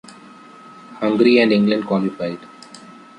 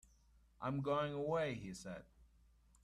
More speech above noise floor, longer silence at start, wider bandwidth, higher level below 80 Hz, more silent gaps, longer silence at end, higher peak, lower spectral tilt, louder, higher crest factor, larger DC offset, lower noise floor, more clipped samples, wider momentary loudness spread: about the same, 26 dB vs 29 dB; first, 0.9 s vs 0.6 s; second, 10.5 kHz vs 12.5 kHz; first, -62 dBFS vs -68 dBFS; neither; second, 0.25 s vs 0.6 s; first, -2 dBFS vs -26 dBFS; about the same, -7 dB/octave vs -6 dB/octave; first, -17 LUFS vs -41 LUFS; about the same, 18 dB vs 18 dB; neither; second, -42 dBFS vs -70 dBFS; neither; first, 26 LU vs 12 LU